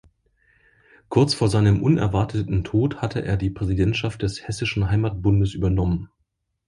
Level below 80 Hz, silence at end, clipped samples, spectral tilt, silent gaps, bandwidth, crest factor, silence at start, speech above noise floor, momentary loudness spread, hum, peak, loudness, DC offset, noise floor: -36 dBFS; 0.6 s; under 0.1%; -7 dB/octave; none; 11.5 kHz; 18 dB; 1.1 s; 53 dB; 8 LU; none; -4 dBFS; -22 LUFS; under 0.1%; -73 dBFS